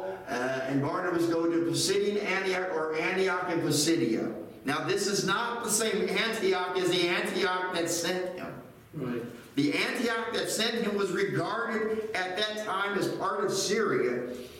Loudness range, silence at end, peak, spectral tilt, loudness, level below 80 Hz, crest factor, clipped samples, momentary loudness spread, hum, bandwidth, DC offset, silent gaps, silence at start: 3 LU; 0 s; -12 dBFS; -3.5 dB/octave; -29 LUFS; -68 dBFS; 16 dB; under 0.1%; 8 LU; none; 16.5 kHz; under 0.1%; none; 0 s